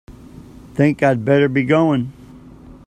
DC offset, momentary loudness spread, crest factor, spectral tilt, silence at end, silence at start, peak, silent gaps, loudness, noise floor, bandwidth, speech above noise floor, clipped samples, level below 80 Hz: under 0.1%; 10 LU; 18 dB; -8 dB/octave; 0.15 s; 0.1 s; 0 dBFS; none; -16 LUFS; -40 dBFS; 10 kHz; 25 dB; under 0.1%; -48 dBFS